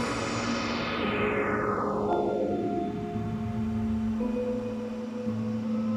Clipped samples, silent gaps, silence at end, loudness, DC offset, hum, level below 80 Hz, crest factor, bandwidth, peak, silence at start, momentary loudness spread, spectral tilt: under 0.1%; none; 0 s; -30 LUFS; under 0.1%; none; -48 dBFS; 14 dB; 10 kHz; -16 dBFS; 0 s; 5 LU; -6 dB/octave